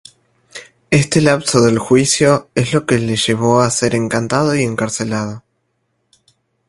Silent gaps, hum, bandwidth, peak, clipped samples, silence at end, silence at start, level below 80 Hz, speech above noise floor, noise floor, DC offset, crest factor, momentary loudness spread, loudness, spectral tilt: none; none; 11.5 kHz; 0 dBFS; under 0.1%; 1.3 s; 0.55 s; -48 dBFS; 53 dB; -67 dBFS; under 0.1%; 16 dB; 14 LU; -14 LUFS; -4.5 dB/octave